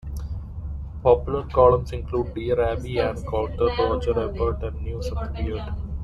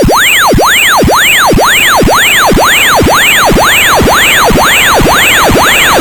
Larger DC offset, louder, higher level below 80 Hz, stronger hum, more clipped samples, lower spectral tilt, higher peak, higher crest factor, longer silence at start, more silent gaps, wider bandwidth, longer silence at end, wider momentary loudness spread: neither; second, -24 LUFS vs -4 LUFS; second, -32 dBFS vs -20 dBFS; neither; neither; first, -8 dB/octave vs -2.5 dB/octave; second, -4 dBFS vs 0 dBFS; first, 20 dB vs 6 dB; about the same, 0.05 s vs 0 s; neither; second, 12 kHz vs 20 kHz; about the same, 0 s vs 0 s; first, 15 LU vs 1 LU